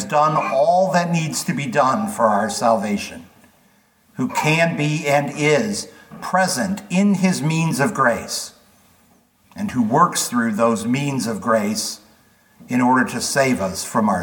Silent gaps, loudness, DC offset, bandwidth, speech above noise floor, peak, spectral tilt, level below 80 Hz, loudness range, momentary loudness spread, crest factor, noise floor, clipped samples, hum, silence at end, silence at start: none; -19 LUFS; under 0.1%; 19 kHz; 38 dB; -2 dBFS; -4.5 dB/octave; -60 dBFS; 2 LU; 9 LU; 18 dB; -57 dBFS; under 0.1%; none; 0 s; 0 s